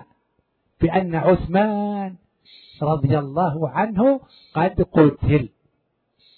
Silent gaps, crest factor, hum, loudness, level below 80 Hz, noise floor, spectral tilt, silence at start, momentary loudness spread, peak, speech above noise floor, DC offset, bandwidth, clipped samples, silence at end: none; 20 dB; none; -20 LUFS; -40 dBFS; -70 dBFS; -12 dB/octave; 0.8 s; 10 LU; 0 dBFS; 51 dB; under 0.1%; 4.5 kHz; under 0.1%; 0.9 s